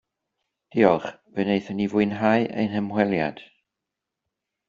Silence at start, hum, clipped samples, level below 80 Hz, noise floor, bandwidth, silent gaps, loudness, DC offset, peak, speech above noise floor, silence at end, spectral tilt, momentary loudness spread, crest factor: 0.75 s; none; under 0.1%; -62 dBFS; -85 dBFS; 7.2 kHz; none; -23 LUFS; under 0.1%; -4 dBFS; 62 dB; 1.25 s; -5.5 dB/octave; 9 LU; 22 dB